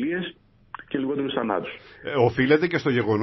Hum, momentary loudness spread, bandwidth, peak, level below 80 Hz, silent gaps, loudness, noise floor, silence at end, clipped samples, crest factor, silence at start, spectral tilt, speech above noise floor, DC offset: none; 17 LU; 6 kHz; -6 dBFS; -56 dBFS; none; -24 LUFS; -44 dBFS; 0 s; under 0.1%; 18 dB; 0 s; -7.5 dB/octave; 22 dB; under 0.1%